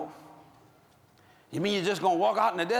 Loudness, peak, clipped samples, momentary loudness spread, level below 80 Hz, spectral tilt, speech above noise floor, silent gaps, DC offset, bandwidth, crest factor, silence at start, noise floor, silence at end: -27 LUFS; -12 dBFS; under 0.1%; 13 LU; -78 dBFS; -4.5 dB/octave; 34 dB; none; under 0.1%; 20 kHz; 18 dB; 0 s; -61 dBFS; 0 s